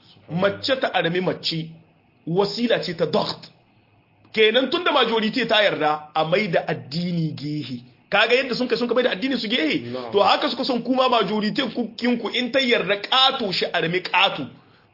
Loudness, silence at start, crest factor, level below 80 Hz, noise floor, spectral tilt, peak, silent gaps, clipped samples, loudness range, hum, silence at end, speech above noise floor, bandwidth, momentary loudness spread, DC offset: -21 LUFS; 0.3 s; 18 dB; -66 dBFS; -58 dBFS; -5.5 dB/octave; -4 dBFS; none; under 0.1%; 3 LU; none; 0.4 s; 37 dB; 5.8 kHz; 10 LU; under 0.1%